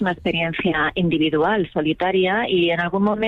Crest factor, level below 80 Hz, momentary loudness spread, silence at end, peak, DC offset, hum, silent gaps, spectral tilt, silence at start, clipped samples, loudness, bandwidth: 10 dB; -48 dBFS; 3 LU; 0 s; -8 dBFS; under 0.1%; none; none; -8 dB/octave; 0 s; under 0.1%; -20 LUFS; 5 kHz